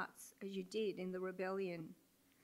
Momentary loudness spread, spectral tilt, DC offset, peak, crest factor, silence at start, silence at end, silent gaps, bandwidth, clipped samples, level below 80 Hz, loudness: 9 LU; -5.5 dB/octave; under 0.1%; -30 dBFS; 14 dB; 0 s; 0.5 s; none; 16 kHz; under 0.1%; -90 dBFS; -45 LUFS